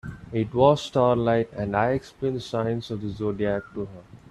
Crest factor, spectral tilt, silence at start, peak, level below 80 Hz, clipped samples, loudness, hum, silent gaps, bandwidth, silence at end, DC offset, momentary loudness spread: 20 dB; -7 dB/octave; 0.05 s; -4 dBFS; -50 dBFS; under 0.1%; -25 LUFS; none; none; 12 kHz; 0.15 s; under 0.1%; 12 LU